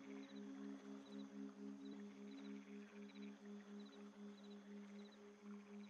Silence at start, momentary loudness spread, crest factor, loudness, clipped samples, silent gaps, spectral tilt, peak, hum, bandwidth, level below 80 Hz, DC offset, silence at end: 0 s; 4 LU; 12 dB; -57 LUFS; under 0.1%; none; -6 dB/octave; -44 dBFS; none; 9.8 kHz; under -90 dBFS; under 0.1%; 0 s